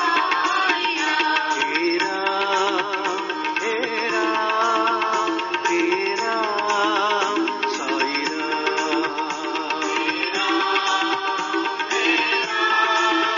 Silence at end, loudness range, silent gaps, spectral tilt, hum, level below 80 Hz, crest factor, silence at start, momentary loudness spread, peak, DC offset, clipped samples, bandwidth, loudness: 0 s; 2 LU; none; 1 dB/octave; none; -72 dBFS; 16 dB; 0 s; 5 LU; -6 dBFS; under 0.1%; under 0.1%; 7.4 kHz; -21 LUFS